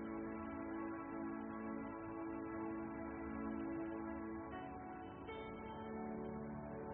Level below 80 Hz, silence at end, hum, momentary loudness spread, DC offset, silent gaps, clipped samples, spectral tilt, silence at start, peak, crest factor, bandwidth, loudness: -66 dBFS; 0 s; none; 5 LU; under 0.1%; none; under 0.1%; -4 dB/octave; 0 s; -34 dBFS; 12 dB; 3.2 kHz; -47 LUFS